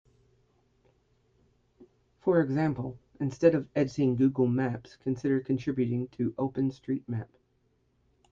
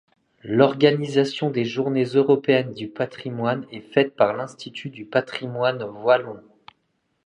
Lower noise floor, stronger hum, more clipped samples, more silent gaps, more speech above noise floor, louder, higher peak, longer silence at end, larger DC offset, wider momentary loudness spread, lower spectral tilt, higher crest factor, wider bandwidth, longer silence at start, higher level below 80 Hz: about the same, -71 dBFS vs -71 dBFS; neither; neither; neither; second, 43 dB vs 50 dB; second, -29 LUFS vs -22 LUFS; second, -8 dBFS vs -2 dBFS; first, 1.05 s vs 0.85 s; neither; second, 11 LU vs 14 LU; first, -8.5 dB/octave vs -6.5 dB/octave; about the same, 22 dB vs 20 dB; second, 7.4 kHz vs 10 kHz; first, 1.8 s vs 0.45 s; about the same, -64 dBFS vs -68 dBFS